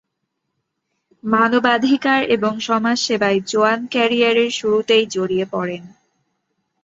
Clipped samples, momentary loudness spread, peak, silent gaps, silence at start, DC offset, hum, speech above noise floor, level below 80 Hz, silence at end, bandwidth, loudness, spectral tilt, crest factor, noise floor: under 0.1%; 6 LU; -2 dBFS; none; 1.25 s; under 0.1%; none; 58 dB; -62 dBFS; 0.95 s; 8 kHz; -17 LUFS; -4 dB/octave; 16 dB; -75 dBFS